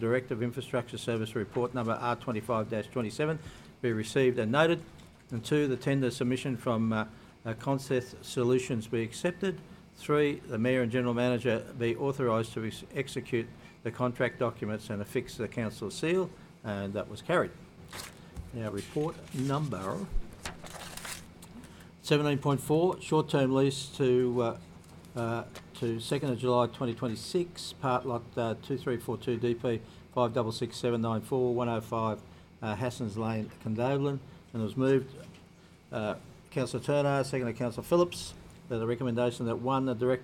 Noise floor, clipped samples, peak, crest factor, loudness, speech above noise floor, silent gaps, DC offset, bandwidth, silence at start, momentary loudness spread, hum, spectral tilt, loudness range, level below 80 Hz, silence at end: -56 dBFS; under 0.1%; -10 dBFS; 22 dB; -32 LUFS; 25 dB; none; under 0.1%; 16.5 kHz; 0 s; 13 LU; none; -6 dB/octave; 5 LU; -54 dBFS; 0 s